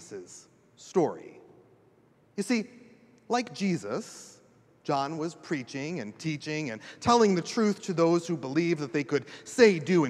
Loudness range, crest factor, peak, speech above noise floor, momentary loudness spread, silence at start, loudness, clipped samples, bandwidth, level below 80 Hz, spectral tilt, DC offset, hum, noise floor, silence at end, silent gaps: 8 LU; 22 dB; -6 dBFS; 35 dB; 19 LU; 0 s; -28 LUFS; under 0.1%; 12.5 kHz; -70 dBFS; -5.5 dB/octave; under 0.1%; none; -62 dBFS; 0 s; none